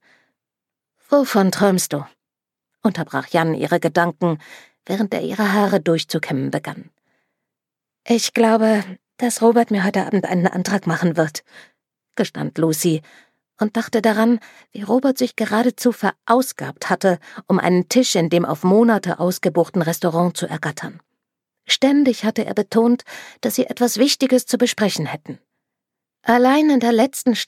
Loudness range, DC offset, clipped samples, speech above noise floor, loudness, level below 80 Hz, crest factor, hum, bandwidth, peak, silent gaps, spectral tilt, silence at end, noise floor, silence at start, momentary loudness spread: 4 LU; under 0.1%; under 0.1%; 68 dB; -18 LUFS; -70 dBFS; 18 dB; none; 16.5 kHz; -2 dBFS; none; -5 dB/octave; 0.05 s; -86 dBFS; 1.1 s; 10 LU